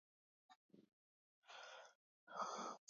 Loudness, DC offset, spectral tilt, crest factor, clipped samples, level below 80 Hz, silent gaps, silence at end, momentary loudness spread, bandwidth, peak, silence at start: -53 LUFS; under 0.1%; -1 dB/octave; 22 dB; under 0.1%; under -90 dBFS; 0.55-0.69 s, 0.93-1.42 s, 1.95-2.27 s; 0.1 s; 14 LU; 7.2 kHz; -34 dBFS; 0.5 s